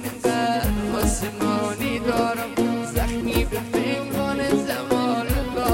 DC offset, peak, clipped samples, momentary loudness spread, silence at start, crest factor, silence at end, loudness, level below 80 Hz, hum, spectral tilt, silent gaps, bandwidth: under 0.1%; -6 dBFS; under 0.1%; 3 LU; 0 s; 16 dB; 0 s; -23 LUFS; -32 dBFS; none; -5 dB/octave; none; 17 kHz